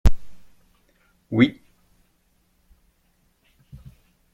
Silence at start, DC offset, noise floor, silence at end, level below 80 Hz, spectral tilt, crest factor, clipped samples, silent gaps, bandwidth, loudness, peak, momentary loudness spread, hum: 0.05 s; under 0.1%; -65 dBFS; 2.85 s; -32 dBFS; -7 dB/octave; 22 dB; under 0.1%; none; 7.8 kHz; -22 LUFS; -2 dBFS; 27 LU; none